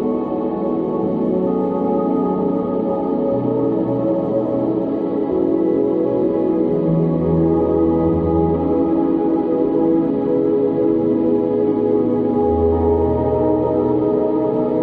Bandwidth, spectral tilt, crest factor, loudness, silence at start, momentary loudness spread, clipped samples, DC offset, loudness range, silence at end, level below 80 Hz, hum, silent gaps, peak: 4.2 kHz; -12 dB/octave; 12 dB; -18 LUFS; 0 s; 3 LU; under 0.1%; under 0.1%; 2 LU; 0 s; -38 dBFS; none; none; -4 dBFS